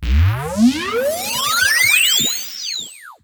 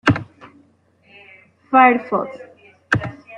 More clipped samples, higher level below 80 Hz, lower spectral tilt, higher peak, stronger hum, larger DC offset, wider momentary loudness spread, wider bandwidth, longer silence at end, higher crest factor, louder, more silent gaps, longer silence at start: neither; first, -26 dBFS vs -50 dBFS; second, -3 dB/octave vs -6.5 dB/octave; about the same, -2 dBFS vs -2 dBFS; neither; neither; second, 12 LU vs 22 LU; first, over 20 kHz vs 8.6 kHz; about the same, 0.1 s vs 0 s; about the same, 16 dB vs 18 dB; about the same, -15 LUFS vs -17 LUFS; neither; about the same, 0 s vs 0.05 s